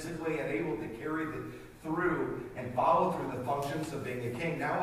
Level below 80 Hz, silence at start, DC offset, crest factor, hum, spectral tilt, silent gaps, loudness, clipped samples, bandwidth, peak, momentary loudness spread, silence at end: -58 dBFS; 0 s; under 0.1%; 18 dB; none; -6.5 dB/octave; none; -34 LUFS; under 0.1%; 15.5 kHz; -14 dBFS; 10 LU; 0 s